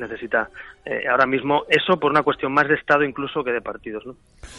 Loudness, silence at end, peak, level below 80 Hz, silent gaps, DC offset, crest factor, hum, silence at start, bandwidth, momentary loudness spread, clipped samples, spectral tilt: -20 LUFS; 0 s; -4 dBFS; -54 dBFS; none; under 0.1%; 18 dB; none; 0 s; 11.5 kHz; 15 LU; under 0.1%; -5.5 dB/octave